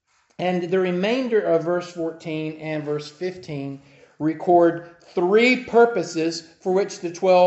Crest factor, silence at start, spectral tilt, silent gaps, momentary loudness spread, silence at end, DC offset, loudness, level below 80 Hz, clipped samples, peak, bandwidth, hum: 18 dB; 0.4 s; -5.5 dB/octave; none; 14 LU; 0 s; under 0.1%; -22 LUFS; -68 dBFS; under 0.1%; -4 dBFS; 8.2 kHz; none